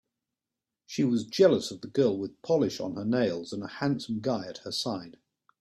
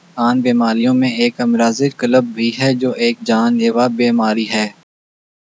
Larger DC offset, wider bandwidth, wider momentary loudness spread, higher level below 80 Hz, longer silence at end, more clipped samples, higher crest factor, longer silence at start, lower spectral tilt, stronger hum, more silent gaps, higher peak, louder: neither; first, 13.5 kHz vs 8 kHz; first, 11 LU vs 3 LU; first, -68 dBFS vs -74 dBFS; second, 0.5 s vs 0.75 s; neither; about the same, 20 dB vs 16 dB; first, 0.9 s vs 0.15 s; about the same, -5.5 dB/octave vs -5.5 dB/octave; neither; neither; second, -8 dBFS vs 0 dBFS; second, -29 LUFS vs -15 LUFS